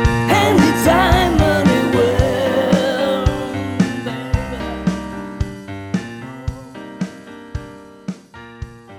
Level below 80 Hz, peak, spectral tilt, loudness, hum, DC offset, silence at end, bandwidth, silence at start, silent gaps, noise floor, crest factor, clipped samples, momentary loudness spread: -30 dBFS; -2 dBFS; -6 dB/octave; -17 LUFS; none; under 0.1%; 0 s; 18.5 kHz; 0 s; none; -38 dBFS; 16 dB; under 0.1%; 20 LU